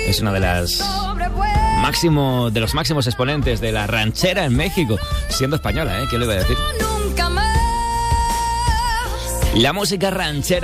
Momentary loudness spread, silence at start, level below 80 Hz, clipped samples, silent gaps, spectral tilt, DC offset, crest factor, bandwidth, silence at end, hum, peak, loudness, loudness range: 4 LU; 0 s; -26 dBFS; under 0.1%; none; -4.5 dB/octave; under 0.1%; 12 dB; 16 kHz; 0 s; none; -6 dBFS; -19 LUFS; 1 LU